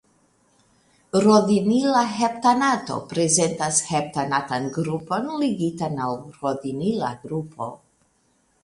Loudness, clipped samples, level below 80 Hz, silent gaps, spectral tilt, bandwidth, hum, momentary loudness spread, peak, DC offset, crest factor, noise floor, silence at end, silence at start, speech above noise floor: -22 LUFS; under 0.1%; -62 dBFS; none; -4.5 dB/octave; 11.5 kHz; none; 11 LU; -4 dBFS; under 0.1%; 18 dB; -65 dBFS; 0.85 s; 1.15 s; 43 dB